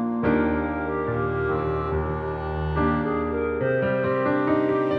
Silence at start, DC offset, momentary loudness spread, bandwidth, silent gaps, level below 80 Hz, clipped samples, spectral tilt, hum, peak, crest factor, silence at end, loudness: 0 s; under 0.1%; 5 LU; 5.2 kHz; none; -38 dBFS; under 0.1%; -10 dB/octave; none; -10 dBFS; 14 dB; 0 s; -24 LUFS